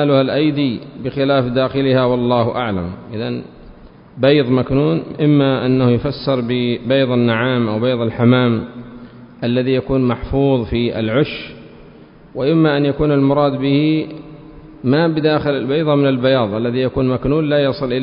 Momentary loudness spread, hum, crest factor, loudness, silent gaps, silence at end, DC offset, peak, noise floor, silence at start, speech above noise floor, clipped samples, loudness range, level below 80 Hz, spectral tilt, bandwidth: 10 LU; none; 16 dB; -16 LUFS; none; 0 s; under 0.1%; 0 dBFS; -41 dBFS; 0 s; 26 dB; under 0.1%; 2 LU; -40 dBFS; -12.5 dB/octave; 5.4 kHz